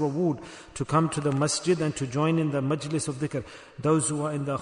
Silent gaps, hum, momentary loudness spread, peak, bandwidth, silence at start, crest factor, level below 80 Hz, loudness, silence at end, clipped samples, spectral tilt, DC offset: none; none; 10 LU; -10 dBFS; 11 kHz; 0 s; 16 dB; -58 dBFS; -27 LUFS; 0 s; under 0.1%; -5.5 dB/octave; under 0.1%